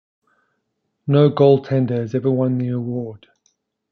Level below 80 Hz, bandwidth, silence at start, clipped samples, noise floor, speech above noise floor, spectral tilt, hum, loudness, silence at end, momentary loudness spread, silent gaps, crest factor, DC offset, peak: -64 dBFS; 6.4 kHz; 1.05 s; under 0.1%; -73 dBFS; 56 dB; -10 dB/octave; none; -18 LUFS; 0.75 s; 14 LU; none; 18 dB; under 0.1%; -2 dBFS